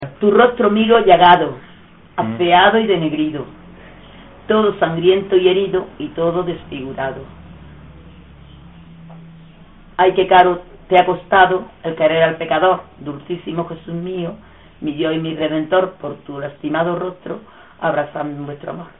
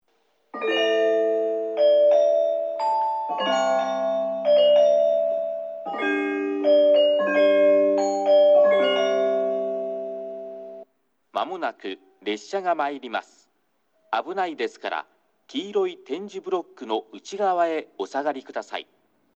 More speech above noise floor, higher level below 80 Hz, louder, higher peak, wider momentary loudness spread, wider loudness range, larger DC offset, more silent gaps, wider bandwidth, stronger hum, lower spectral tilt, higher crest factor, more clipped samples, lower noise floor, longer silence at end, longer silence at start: second, 28 dB vs 43 dB; first, -48 dBFS vs -88 dBFS; first, -16 LUFS vs -22 LUFS; first, 0 dBFS vs -8 dBFS; about the same, 17 LU vs 16 LU; about the same, 10 LU vs 11 LU; first, 0.2% vs under 0.1%; neither; second, 4 kHz vs 7.6 kHz; neither; about the same, -3.5 dB/octave vs -4 dB/octave; about the same, 18 dB vs 14 dB; neither; second, -44 dBFS vs -70 dBFS; second, 0.1 s vs 0.55 s; second, 0 s vs 0.55 s